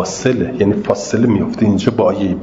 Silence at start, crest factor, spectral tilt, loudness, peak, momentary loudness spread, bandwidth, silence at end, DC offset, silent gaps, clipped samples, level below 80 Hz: 0 s; 14 dB; -6.5 dB/octave; -15 LUFS; 0 dBFS; 3 LU; 7.8 kHz; 0 s; under 0.1%; none; under 0.1%; -46 dBFS